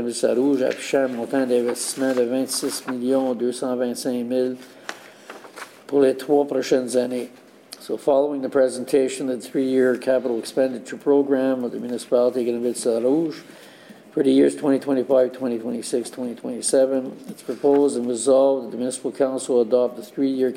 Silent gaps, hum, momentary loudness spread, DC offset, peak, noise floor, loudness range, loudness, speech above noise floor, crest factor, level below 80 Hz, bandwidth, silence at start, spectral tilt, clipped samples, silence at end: none; none; 12 LU; under 0.1%; -6 dBFS; -42 dBFS; 3 LU; -22 LUFS; 21 dB; 16 dB; -70 dBFS; 16 kHz; 0 s; -4.5 dB/octave; under 0.1%; 0 s